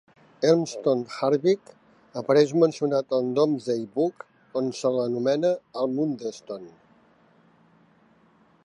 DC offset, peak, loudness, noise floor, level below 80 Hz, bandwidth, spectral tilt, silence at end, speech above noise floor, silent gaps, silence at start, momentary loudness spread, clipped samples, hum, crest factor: under 0.1%; -6 dBFS; -25 LUFS; -60 dBFS; -78 dBFS; 11 kHz; -6 dB/octave; 1.95 s; 36 dB; none; 0.4 s; 12 LU; under 0.1%; none; 20 dB